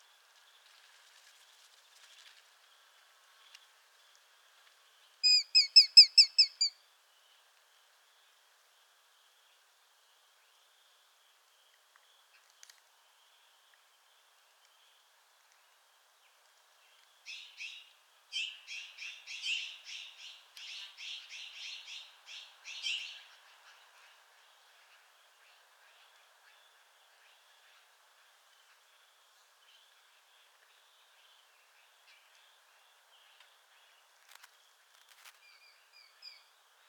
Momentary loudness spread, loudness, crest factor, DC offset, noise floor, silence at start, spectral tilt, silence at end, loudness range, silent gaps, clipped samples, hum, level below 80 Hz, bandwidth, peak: 30 LU; -25 LUFS; 30 dB; under 0.1%; -68 dBFS; 5.25 s; 9 dB/octave; 13.8 s; 22 LU; none; under 0.1%; none; under -90 dBFS; 19 kHz; -6 dBFS